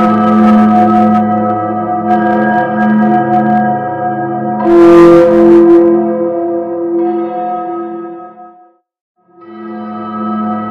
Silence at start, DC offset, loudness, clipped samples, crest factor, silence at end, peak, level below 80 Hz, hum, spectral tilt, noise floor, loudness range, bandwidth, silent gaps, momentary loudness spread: 0 s; under 0.1%; -9 LUFS; 1%; 10 dB; 0 s; 0 dBFS; -44 dBFS; none; -8.5 dB/octave; -44 dBFS; 13 LU; 5.8 kHz; 9.01-9.15 s; 16 LU